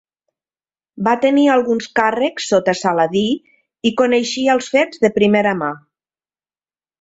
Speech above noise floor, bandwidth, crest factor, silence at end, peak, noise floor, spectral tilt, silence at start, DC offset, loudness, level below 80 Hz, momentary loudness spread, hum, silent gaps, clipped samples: over 74 dB; 8 kHz; 16 dB; 1.25 s; 0 dBFS; under -90 dBFS; -4.5 dB/octave; 0.95 s; under 0.1%; -16 LUFS; -60 dBFS; 8 LU; none; none; under 0.1%